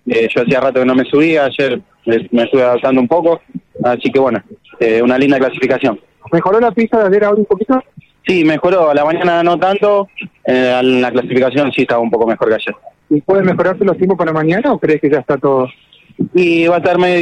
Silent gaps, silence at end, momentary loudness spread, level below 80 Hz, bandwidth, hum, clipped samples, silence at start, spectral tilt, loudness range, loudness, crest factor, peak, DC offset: none; 0 s; 6 LU; -50 dBFS; 9 kHz; none; under 0.1%; 0.05 s; -7.5 dB/octave; 1 LU; -13 LUFS; 10 dB; -2 dBFS; under 0.1%